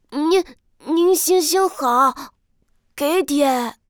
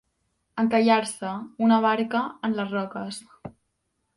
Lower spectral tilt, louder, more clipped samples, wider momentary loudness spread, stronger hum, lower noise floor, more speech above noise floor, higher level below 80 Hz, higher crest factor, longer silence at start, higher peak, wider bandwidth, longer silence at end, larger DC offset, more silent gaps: second, -1.5 dB/octave vs -5 dB/octave; first, -18 LUFS vs -24 LUFS; neither; second, 10 LU vs 18 LU; neither; second, -62 dBFS vs -76 dBFS; second, 44 dB vs 52 dB; first, -58 dBFS vs -66 dBFS; about the same, 14 dB vs 18 dB; second, 0.1 s vs 0.55 s; about the same, -6 dBFS vs -8 dBFS; first, over 20 kHz vs 11.5 kHz; second, 0.2 s vs 0.65 s; neither; neither